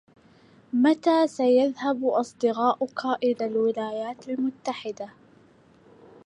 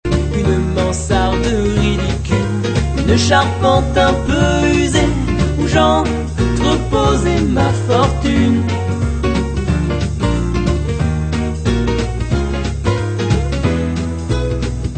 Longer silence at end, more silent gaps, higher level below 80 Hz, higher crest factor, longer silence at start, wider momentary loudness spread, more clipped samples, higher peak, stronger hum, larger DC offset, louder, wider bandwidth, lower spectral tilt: first, 1.2 s vs 0 s; neither; second, -76 dBFS vs -22 dBFS; about the same, 16 dB vs 14 dB; first, 0.75 s vs 0.05 s; first, 12 LU vs 5 LU; neither; second, -10 dBFS vs 0 dBFS; neither; neither; second, -25 LUFS vs -16 LUFS; first, 10.5 kHz vs 9.2 kHz; about the same, -5 dB/octave vs -6 dB/octave